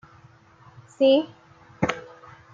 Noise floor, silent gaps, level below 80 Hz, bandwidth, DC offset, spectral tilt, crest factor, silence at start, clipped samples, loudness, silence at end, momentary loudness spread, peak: -53 dBFS; none; -60 dBFS; 7.6 kHz; under 0.1%; -6 dB/octave; 20 dB; 1 s; under 0.1%; -23 LUFS; 0.5 s; 19 LU; -8 dBFS